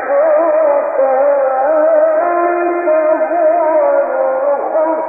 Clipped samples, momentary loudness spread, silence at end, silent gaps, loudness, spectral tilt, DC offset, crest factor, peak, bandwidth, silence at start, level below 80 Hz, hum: under 0.1%; 3 LU; 0 s; none; -13 LUFS; -9.5 dB/octave; under 0.1%; 10 dB; -2 dBFS; 2.6 kHz; 0 s; -64 dBFS; none